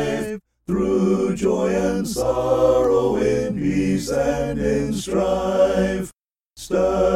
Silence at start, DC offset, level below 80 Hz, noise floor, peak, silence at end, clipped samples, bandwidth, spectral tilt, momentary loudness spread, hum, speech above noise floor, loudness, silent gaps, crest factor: 0 s; under 0.1%; -40 dBFS; -47 dBFS; -6 dBFS; 0 s; under 0.1%; 15.5 kHz; -6 dB/octave; 8 LU; none; 28 dB; -20 LUFS; none; 14 dB